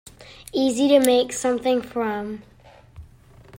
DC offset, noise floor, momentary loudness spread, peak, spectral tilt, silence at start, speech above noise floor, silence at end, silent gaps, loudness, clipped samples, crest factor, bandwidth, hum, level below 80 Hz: under 0.1%; -49 dBFS; 17 LU; -2 dBFS; -3.5 dB/octave; 0.2 s; 27 dB; 0.05 s; none; -21 LUFS; under 0.1%; 20 dB; 16 kHz; none; -54 dBFS